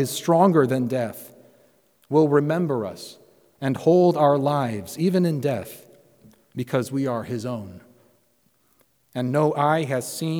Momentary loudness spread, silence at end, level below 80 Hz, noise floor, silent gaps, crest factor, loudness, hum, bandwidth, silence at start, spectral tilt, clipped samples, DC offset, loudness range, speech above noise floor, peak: 16 LU; 0 s; -70 dBFS; -65 dBFS; none; 18 dB; -22 LUFS; none; over 20 kHz; 0 s; -6.5 dB/octave; under 0.1%; under 0.1%; 9 LU; 43 dB; -4 dBFS